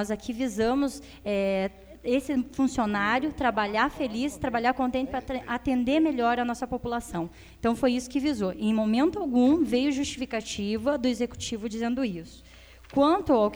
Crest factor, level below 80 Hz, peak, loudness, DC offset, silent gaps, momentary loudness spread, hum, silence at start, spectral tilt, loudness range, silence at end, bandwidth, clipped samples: 16 dB; -50 dBFS; -10 dBFS; -27 LUFS; under 0.1%; none; 9 LU; none; 0 s; -5 dB/octave; 2 LU; 0 s; over 20 kHz; under 0.1%